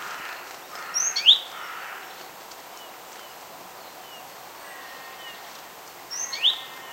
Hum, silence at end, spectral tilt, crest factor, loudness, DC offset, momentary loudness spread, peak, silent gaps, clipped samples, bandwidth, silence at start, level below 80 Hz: none; 0 s; 2.5 dB/octave; 28 dB; -22 LUFS; under 0.1%; 23 LU; -2 dBFS; none; under 0.1%; 16 kHz; 0 s; -76 dBFS